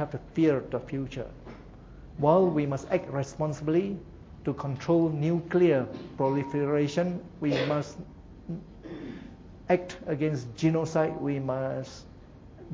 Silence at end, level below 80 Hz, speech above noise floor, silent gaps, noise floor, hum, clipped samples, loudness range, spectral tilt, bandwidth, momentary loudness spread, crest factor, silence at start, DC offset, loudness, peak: 0 s; -54 dBFS; 21 dB; none; -49 dBFS; none; under 0.1%; 5 LU; -7.5 dB/octave; 7.8 kHz; 21 LU; 20 dB; 0 s; under 0.1%; -28 LUFS; -8 dBFS